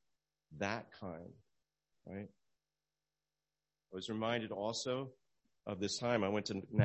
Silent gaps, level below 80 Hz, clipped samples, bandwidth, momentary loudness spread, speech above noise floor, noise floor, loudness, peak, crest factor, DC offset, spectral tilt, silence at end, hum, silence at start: none; -70 dBFS; under 0.1%; 8 kHz; 17 LU; over 51 dB; under -90 dBFS; -40 LUFS; -16 dBFS; 24 dB; under 0.1%; -5 dB/octave; 0 s; 50 Hz at -75 dBFS; 0.5 s